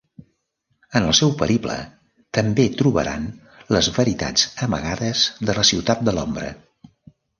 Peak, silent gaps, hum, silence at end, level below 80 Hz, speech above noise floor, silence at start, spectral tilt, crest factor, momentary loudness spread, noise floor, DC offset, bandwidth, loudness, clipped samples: -2 dBFS; none; none; 0.8 s; -44 dBFS; 51 dB; 0.2 s; -4 dB/octave; 20 dB; 13 LU; -71 dBFS; under 0.1%; 10.5 kHz; -20 LUFS; under 0.1%